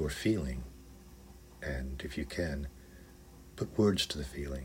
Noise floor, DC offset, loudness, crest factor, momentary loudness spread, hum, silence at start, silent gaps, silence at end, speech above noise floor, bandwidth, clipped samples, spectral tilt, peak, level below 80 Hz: -54 dBFS; under 0.1%; -35 LUFS; 20 dB; 25 LU; none; 0 s; none; 0 s; 20 dB; 16 kHz; under 0.1%; -5.5 dB/octave; -16 dBFS; -46 dBFS